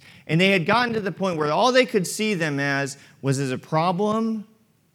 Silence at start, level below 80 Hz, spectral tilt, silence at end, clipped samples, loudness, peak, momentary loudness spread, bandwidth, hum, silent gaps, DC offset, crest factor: 0.25 s; -70 dBFS; -5 dB/octave; 0.5 s; under 0.1%; -22 LUFS; -4 dBFS; 8 LU; 17 kHz; none; none; under 0.1%; 18 dB